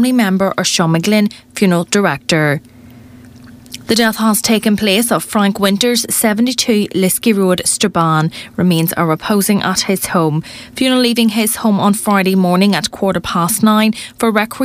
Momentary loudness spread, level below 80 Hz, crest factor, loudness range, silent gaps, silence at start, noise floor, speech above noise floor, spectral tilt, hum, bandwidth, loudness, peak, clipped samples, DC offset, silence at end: 5 LU; -48 dBFS; 14 dB; 2 LU; none; 0 s; -38 dBFS; 24 dB; -4 dB/octave; none; 16 kHz; -13 LUFS; 0 dBFS; under 0.1%; under 0.1%; 0 s